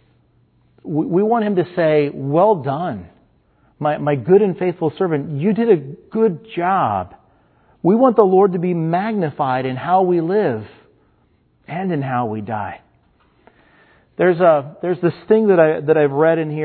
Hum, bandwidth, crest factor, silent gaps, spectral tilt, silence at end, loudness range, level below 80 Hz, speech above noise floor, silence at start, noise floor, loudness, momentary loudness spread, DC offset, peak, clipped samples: none; 4.5 kHz; 18 dB; none; -12 dB/octave; 0 s; 6 LU; -62 dBFS; 42 dB; 0.85 s; -59 dBFS; -17 LUFS; 11 LU; under 0.1%; 0 dBFS; under 0.1%